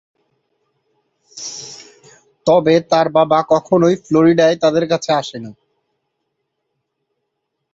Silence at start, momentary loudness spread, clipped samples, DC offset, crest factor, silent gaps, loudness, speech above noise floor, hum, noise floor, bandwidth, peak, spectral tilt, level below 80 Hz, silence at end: 1.35 s; 18 LU; under 0.1%; under 0.1%; 16 dB; none; -14 LUFS; 61 dB; none; -75 dBFS; 8 kHz; -2 dBFS; -5.5 dB/octave; -60 dBFS; 2.2 s